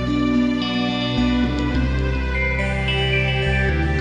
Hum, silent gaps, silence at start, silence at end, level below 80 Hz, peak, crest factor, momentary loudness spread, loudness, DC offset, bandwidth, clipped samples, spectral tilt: none; none; 0 s; 0 s; -26 dBFS; -8 dBFS; 12 dB; 3 LU; -20 LUFS; under 0.1%; 9.6 kHz; under 0.1%; -6.5 dB/octave